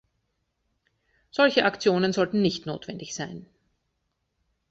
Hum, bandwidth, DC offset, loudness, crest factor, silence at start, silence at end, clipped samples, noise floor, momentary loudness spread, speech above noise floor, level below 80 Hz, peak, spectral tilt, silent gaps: none; 8 kHz; under 0.1%; -25 LUFS; 22 dB; 1.35 s; 1.25 s; under 0.1%; -77 dBFS; 15 LU; 53 dB; -64 dBFS; -6 dBFS; -5 dB/octave; none